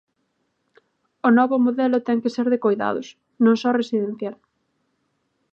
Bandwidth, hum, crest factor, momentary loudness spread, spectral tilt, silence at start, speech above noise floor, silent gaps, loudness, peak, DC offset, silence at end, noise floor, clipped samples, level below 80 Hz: 7 kHz; none; 18 dB; 12 LU; -6.5 dB/octave; 1.25 s; 52 dB; none; -20 LUFS; -6 dBFS; under 0.1%; 1.2 s; -72 dBFS; under 0.1%; -74 dBFS